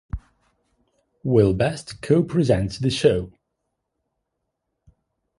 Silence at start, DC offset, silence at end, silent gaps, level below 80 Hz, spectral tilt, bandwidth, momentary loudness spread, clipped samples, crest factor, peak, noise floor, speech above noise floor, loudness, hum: 0.15 s; under 0.1%; 2.1 s; none; -44 dBFS; -7 dB/octave; 11.5 kHz; 16 LU; under 0.1%; 20 dB; -4 dBFS; -79 dBFS; 59 dB; -21 LUFS; none